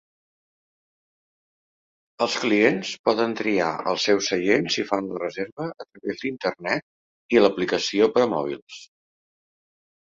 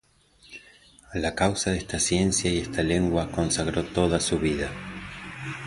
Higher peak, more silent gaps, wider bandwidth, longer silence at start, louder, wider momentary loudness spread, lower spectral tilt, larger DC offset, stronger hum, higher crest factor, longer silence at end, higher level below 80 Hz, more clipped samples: about the same, -4 dBFS vs -6 dBFS; first, 2.99-3.04 s, 5.52-5.57 s, 6.83-7.29 s, 8.62-8.67 s vs none; second, 7.8 kHz vs 11.5 kHz; first, 2.2 s vs 0.5 s; about the same, -23 LUFS vs -25 LUFS; second, 12 LU vs 15 LU; about the same, -4 dB/octave vs -4 dB/octave; neither; neither; about the same, 22 dB vs 20 dB; first, 1.25 s vs 0 s; second, -66 dBFS vs -42 dBFS; neither